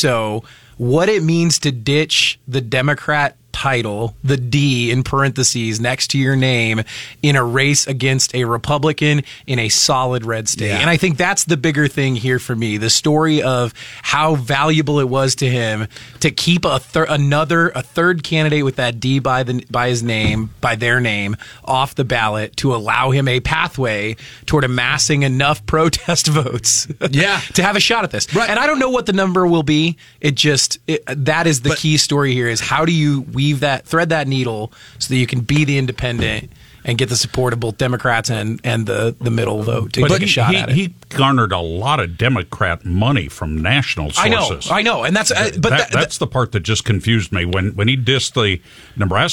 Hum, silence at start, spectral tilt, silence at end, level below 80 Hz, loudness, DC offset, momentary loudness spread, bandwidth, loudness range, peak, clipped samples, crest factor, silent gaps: none; 0 s; -4 dB/octave; 0 s; -40 dBFS; -16 LUFS; 0.4%; 6 LU; 16.5 kHz; 3 LU; 0 dBFS; under 0.1%; 16 dB; none